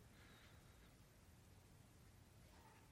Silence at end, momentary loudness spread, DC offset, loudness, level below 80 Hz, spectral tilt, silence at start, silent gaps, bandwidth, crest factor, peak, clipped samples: 0 s; 3 LU; under 0.1%; -67 LUFS; -74 dBFS; -4.5 dB/octave; 0 s; none; 16 kHz; 12 dB; -54 dBFS; under 0.1%